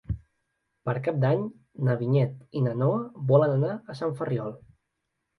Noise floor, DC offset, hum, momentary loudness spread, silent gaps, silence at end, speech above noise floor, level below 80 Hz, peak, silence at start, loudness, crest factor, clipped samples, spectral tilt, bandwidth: -80 dBFS; under 0.1%; none; 14 LU; none; 0.8 s; 55 dB; -52 dBFS; -6 dBFS; 0.1 s; -27 LUFS; 20 dB; under 0.1%; -10 dB/octave; 5.6 kHz